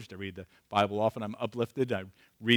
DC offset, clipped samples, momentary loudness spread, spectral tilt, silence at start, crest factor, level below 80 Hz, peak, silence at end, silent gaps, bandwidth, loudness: under 0.1%; under 0.1%; 13 LU; -6 dB/octave; 0 s; 20 dB; -72 dBFS; -10 dBFS; 0 s; none; over 20 kHz; -32 LUFS